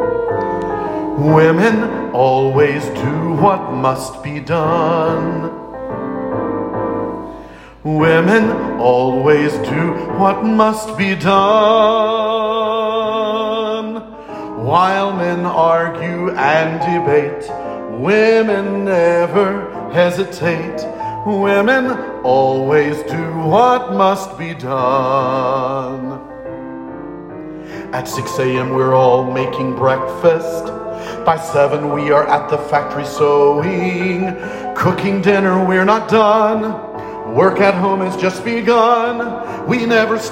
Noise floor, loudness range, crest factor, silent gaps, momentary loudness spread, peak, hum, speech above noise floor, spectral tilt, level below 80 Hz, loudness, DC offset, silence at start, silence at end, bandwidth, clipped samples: -35 dBFS; 5 LU; 14 dB; none; 13 LU; 0 dBFS; none; 21 dB; -6.5 dB/octave; -48 dBFS; -15 LUFS; under 0.1%; 0 s; 0 s; 16 kHz; under 0.1%